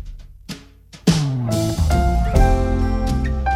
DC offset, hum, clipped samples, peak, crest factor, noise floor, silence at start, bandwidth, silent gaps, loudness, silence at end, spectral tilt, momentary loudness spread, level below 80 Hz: under 0.1%; none; under 0.1%; -2 dBFS; 16 dB; -43 dBFS; 0 s; 16 kHz; none; -19 LUFS; 0 s; -6.5 dB/octave; 18 LU; -22 dBFS